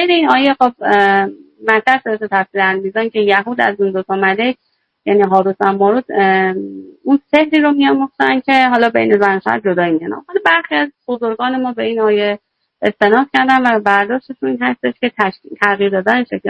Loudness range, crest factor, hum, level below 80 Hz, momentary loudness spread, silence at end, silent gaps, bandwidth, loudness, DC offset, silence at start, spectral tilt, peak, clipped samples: 2 LU; 14 dB; none; -60 dBFS; 8 LU; 0 s; none; 9 kHz; -14 LUFS; under 0.1%; 0 s; -6.5 dB/octave; 0 dBFS; 0.2%